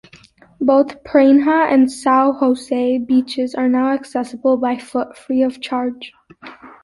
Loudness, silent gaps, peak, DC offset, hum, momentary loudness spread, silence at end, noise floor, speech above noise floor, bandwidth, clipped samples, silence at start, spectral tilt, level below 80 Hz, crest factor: -16 LUFS; none; -2 dBFS; under 0.1%; none; 10 LU; 0.15 s; -47 dBFS; 31 dB; 11.5 kHz; under 0.1%; 0.6 s; -4.5 dB/octave; -58 dBFS; 14 dB